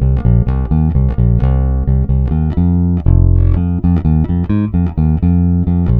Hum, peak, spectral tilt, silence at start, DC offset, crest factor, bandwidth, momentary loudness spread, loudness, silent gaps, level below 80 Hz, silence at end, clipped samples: none; 0 dBFS; -12.5 dB/octave; 0 s; under 0.1%; 12 dB; 3.5 kHz; 3 LU; -14 LUFS; none; -16 dBFS; 0 s; under 0.1%